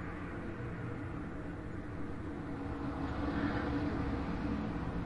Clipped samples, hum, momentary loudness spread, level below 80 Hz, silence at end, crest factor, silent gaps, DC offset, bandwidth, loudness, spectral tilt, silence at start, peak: under 0.1%; none; 8 LU; -48 dBFS; 0 s; 16 dB; none; under 0.1%; 11 kHz; -39 LUFS; -8 dB/octave; 0 s; -22 dBFS